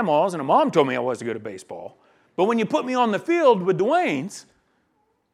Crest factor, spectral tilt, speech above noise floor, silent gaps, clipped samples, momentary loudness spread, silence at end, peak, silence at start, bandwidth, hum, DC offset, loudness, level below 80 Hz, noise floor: 18 dB; -6 dB/octave; 47 dB; none; under 0.1%; 18 LU; 0.9 s; -4 dBFS; 0 s; 12.5 kHz; none; under 0.1%; -21 LUFS; -74 dBFS; -68 dBFS